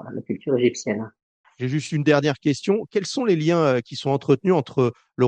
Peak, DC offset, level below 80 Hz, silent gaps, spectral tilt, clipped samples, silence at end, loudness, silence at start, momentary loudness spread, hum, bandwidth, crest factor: -4 dBFS; under 0.1%; -64 dBFS; 1.23-1.44 s; -6 dB/octave; under 0.1%; 0 s; -22 LUFS; 0 s; 9 LU; none; 9.4 kHz; 18 dB